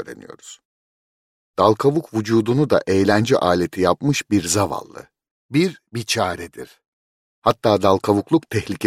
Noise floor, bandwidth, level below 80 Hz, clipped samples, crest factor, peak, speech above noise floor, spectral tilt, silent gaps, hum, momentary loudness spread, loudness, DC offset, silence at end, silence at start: under -90 dBFS; 16 kHz; -54 dBFS; under 0.1%; 18 dB; -2 dBFS; over 71 dB; -5 dB/octave; 0.65-1.54 s, 5.31-5.49 s, 6.87-7.42 s; none; 15 LU; -19 LUFS; under 0.1%; 0 s; 0 s